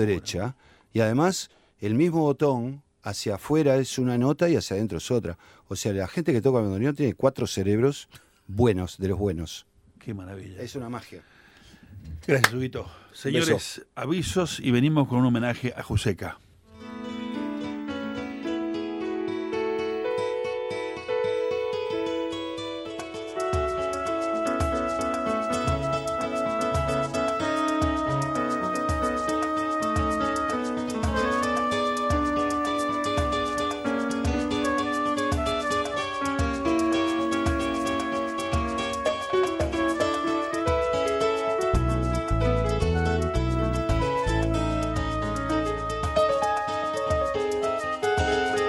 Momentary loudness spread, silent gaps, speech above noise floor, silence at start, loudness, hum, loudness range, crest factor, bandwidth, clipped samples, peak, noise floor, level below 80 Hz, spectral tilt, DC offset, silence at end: 11 LU; none; 28 dB; 0 s; -26 LUFS; none; 5 LU; 22 dB; 16 kHz; under 0.1%; -4 dBFS; -53 dBFS; -38 dBFS; -5.5 dB/octave; under 0.1%; 0 s